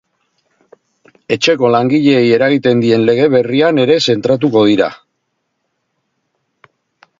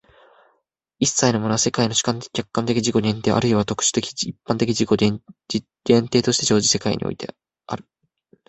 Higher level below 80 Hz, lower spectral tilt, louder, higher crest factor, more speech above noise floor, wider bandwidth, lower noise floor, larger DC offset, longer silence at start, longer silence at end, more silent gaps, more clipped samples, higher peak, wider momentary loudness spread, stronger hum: about the same, -56 dBFS vs -52 dBFS; first, -6 dB/octave vs -4 dB/octave; first, -12 LUFS vs -20 LUFS; second, 14 dB vs 20 dB; first, 58 dB vs 49 dB; second, 7.6 kHz vs 8.4 kHz; about the same, -69 dBFS vs -69 dBFS; neither; first, 1.3 s vs 1 s; first, 2.25 s vs 0.7 s; neither; neither; about the same, 0 dBFS vs -2 dBFS; second, 3 LU vs 12 LU; neither